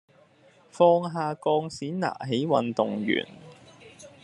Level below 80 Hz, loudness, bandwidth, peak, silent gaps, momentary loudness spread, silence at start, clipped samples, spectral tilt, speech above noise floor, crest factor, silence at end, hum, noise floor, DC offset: -72 dBFS; -26 LUFS; 11 kHz; -6 dBFS; none; 9 LU; 0.75 s; under 0.1%; -6 dB/octave; 33 dB; 20 dB; 0.15 s; none; -58 dBFS; under 0.1%